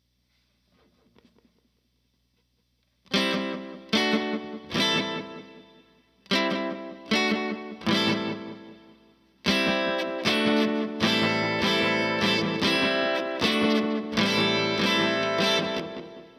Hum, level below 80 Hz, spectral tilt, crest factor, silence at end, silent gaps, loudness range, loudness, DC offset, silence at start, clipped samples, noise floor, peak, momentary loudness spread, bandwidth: none; -62 dBFS; -4 dB/octave; 20 dB; 0.1 s; none; 6 LU; -25 LUFS; under 0.1%; 3.1 s; under 0.1%; -71 dBFS; -8 dBFS; 11 LU; 14.5 kHz